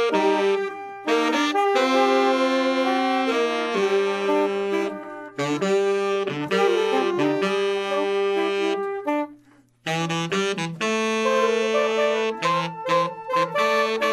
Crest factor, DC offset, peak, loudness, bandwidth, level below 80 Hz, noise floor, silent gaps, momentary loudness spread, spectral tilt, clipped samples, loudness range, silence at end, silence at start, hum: 16 dB; under 0.1%; -6 dBFS; -22 LUFS; 13.5 kHz; -72 dBFS; -55 dBFS; none; 6 LU; -4.5 dB/octave; under 0.1%; 4 LU; 0 s; 0 s; none